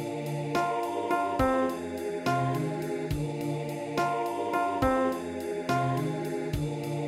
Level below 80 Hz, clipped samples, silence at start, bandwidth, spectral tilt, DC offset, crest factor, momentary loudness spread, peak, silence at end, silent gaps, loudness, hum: -48 dBFS; under 0.1%; 0 s; 16.5 kHz; -6.5 dB/octave; under 0.1%; 16 dB; 7 LU; -14 dBFS; 0 s; none; -30 LUFS; none